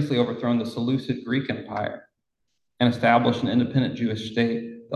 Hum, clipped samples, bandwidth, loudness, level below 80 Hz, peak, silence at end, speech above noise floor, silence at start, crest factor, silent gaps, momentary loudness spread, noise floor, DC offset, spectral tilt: none; under 0.1%; 9.4 kHz; -24 LUFS; -58 dBFS; -4 dBFS; 0 s; 56 dB; 0 s; 20 dB; none; 11 LU; -79 dBFS; under 0.1%; -7 dB/octave